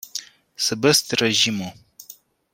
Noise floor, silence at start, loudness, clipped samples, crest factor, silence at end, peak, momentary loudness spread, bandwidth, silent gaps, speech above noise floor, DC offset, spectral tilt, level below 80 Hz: -48 dBFS; 0.05 s; -19 LUFS; under 0.1%; 20 dB; 0.4 s; -2 dBFS; 16 LU; 16.5 kHz; none; 27 dB; under 0.1%; -2.5 dB/octave; -64 dBFS